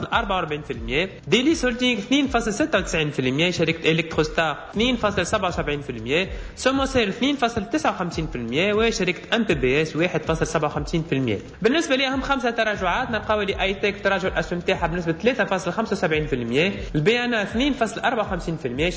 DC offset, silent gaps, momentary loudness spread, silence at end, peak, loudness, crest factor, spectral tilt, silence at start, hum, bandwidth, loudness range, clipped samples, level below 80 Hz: under 0.1%; none; 5 LU; 0 s; -6 dBFS; -22 LUFS; 16 dB; -5 dB/octave; 0 s; none; 8 kHz; 2 LU; under 0.1%; -40 dBFS